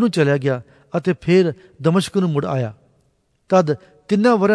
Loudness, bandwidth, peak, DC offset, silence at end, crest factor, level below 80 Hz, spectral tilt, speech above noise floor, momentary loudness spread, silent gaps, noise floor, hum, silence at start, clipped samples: -19 LUFS; 11 kHz; -2 dBFS; under 0.1%; 0 s; 16 dB; -58 dBFS; -7 dB/octave; 46 dB; 9 LU; none; -63 dBFS; none; 0 s; under 0.1%